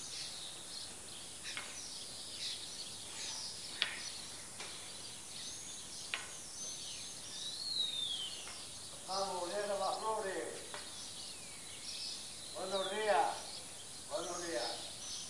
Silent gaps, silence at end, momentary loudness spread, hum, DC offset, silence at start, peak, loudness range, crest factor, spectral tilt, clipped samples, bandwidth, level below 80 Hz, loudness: none; 0 s; 9 LU; none; 0.1%; 0 s; -12 dBFS; 4 LU; 30 dB; -1 dB/octave; under 0.1%; 11.5 kHz; -72 dBFS; -41 LUFS